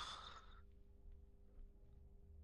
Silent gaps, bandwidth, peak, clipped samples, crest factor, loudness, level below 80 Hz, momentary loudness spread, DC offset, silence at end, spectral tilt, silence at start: none; 12 kHz; -38 dBFS; under 0.1%; 20 dB; -61 LUFS; -62 dBFS; 13 LU; under 0.1%; 0 s; -2.5 dB/octave; 0 s